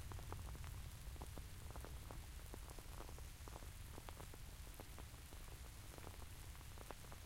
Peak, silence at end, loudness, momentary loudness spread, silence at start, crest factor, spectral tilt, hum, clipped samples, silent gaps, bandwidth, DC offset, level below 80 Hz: -32 dBFS; 0 s; -55 LUFS; 4 LU; 0 s; 20 dB; -4 dB/octave; none; under 0.1%; none; 16.5 kHz; under 0.1%; -56 dBFS